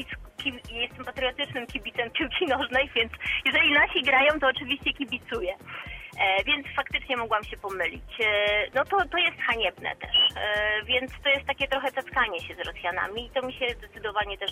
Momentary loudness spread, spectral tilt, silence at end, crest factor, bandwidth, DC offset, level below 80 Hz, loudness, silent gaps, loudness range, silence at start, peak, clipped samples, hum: 11 LU; -4 dB/octave; 0 s; 18 dB; 16 kHz; under 0.1%; -48 dBFS; -25 LUFS; none; 5 LU; 0 s; -10 dBFS; under 0.1%; none